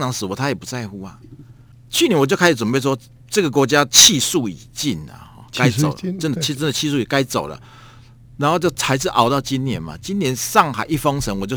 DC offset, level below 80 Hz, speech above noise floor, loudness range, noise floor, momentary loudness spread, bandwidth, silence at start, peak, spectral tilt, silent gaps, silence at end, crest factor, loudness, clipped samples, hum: under 0.1%; -46 dBFS; 26 dB; 6 LU; -44 dBFS; 13 LU; over 20 kHz; 0 s; 0 dBFS; -3.5 dB/octave; none; 0 s; 20 dB; -17 LUFS; under 0.1%; none